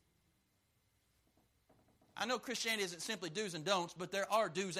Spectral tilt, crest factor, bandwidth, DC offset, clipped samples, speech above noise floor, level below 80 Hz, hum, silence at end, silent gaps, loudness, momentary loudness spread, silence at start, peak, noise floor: -2.5 dB/octave; 22 dB; 15 kHz; under 0.1%; under 0.1%; 39 dB; -82 dBFS; none; 0 s; none; -38 LUFS; 6 LU; 2.15 s; -20 dBFS; -78 dBFS